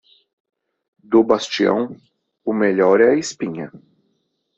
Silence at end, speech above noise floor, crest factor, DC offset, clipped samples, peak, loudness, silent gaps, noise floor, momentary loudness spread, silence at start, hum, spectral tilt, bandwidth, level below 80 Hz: 0.8 s; 52 dB; 18 dB; under 0.1%; under 0.1%; -2 dBFS; -18 LUFS; none; -69 dBFS; 15 LU; 1.1 s; none; -5 dB/octave; 8.2 kHz; -62 dBFS